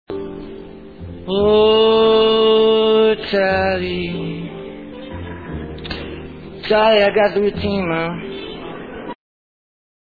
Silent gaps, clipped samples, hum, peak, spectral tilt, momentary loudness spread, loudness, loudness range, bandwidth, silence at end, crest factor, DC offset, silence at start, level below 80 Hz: none; under 0.1%; none; -2 dBFS; -7.5 dB/octave; 20 LU; -15 LUFS; 8 LU; 4.9 kHz; 0.95 s; 16 dB; 0.3%; 0.1 s; -42 dBFS